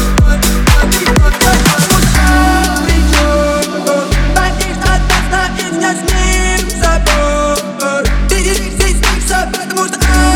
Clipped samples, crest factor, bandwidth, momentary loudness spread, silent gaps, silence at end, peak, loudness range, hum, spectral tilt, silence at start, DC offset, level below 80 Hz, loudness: under 0.1%; 10 dB; 18.5 kHz; 5 LU; none; 0 s; 0 dBFS; 3 LU; none; -4 dB/octave; 0 s; under 0.1%; -14 dBFS; -11 LUFS